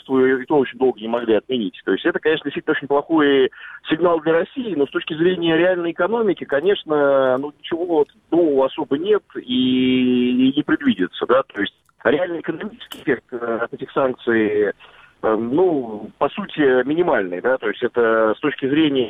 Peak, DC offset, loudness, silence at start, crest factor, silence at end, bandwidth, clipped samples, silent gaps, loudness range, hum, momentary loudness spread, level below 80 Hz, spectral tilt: -2 dBFS; under 0.1%; -19 LUFS; 0.1 s; 16 dB; 0 s; 4 kHz; under 0.1%; none; 3 LU; none; 8 LU; -60 dBFS; -7.5 dB/octave